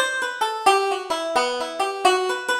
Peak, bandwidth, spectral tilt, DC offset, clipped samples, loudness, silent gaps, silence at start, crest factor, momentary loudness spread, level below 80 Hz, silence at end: -4 dBFS; 16.5 kHz; -0.5 dB/octave; under 0.1%; under 0.1%; -21 LUFS; none; 0 s; 18 dB; 6 LU; -64 dBFS; 0 s